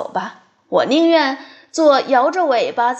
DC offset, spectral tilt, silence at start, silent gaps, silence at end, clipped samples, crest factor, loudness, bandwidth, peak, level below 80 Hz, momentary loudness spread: under 0.1%; -4 dB/octave; 0 s; none; 0 s; under 0.1%; 14 dB; -16 LUFS; 8.6 kHz; -2 dBFS; -74 dBFS; 13 LU